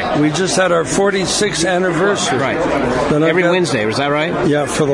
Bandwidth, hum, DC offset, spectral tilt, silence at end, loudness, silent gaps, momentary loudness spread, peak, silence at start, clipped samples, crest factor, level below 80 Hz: 11.5 kHz; none; under 0.1%; -4 dB/octave; 0 s; -15 LUFS; none; 3 LU; -2 dBFS; 0 s; under 0.1%; 12 dB; -42 dBFS